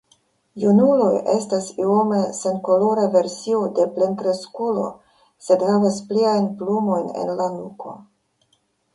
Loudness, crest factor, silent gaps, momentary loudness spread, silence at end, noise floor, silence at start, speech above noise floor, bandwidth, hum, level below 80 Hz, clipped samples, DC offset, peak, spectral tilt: -20 LUFS; 18 dB; none; 9 LU; 0.95 s; -66 dBFS; 0.55 s; 47 dB; 11.5 kHz; none; -66 dBFS; under 0.1%; under 0.1%; -4 dBFS; -6.5 dB/octave